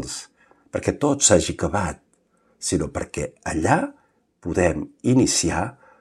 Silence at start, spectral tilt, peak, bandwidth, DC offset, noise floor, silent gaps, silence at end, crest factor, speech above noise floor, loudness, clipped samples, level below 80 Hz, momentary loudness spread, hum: 0 s; -4 dB/octave; -2 dBFS; 15 kHz; under 0.1%; -63 dBFS; none; 0.3 s; 22 dB; 42 dB; -22 LUFS; under 0.1%; -42 dBFS; 15 LU; none